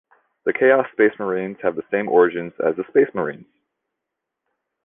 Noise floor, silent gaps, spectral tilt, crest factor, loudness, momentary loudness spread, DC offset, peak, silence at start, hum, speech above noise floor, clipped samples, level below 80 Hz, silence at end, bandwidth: -82 dBFS; none; -9.5 dB/octave; 18 dB; -20 LUFS; 9 LU; under 0.1%; -2 dBFS; 0.45 s; none; 63 dB; under 0.1%; -64 dBFS; 1.4 s; 3.7 kHz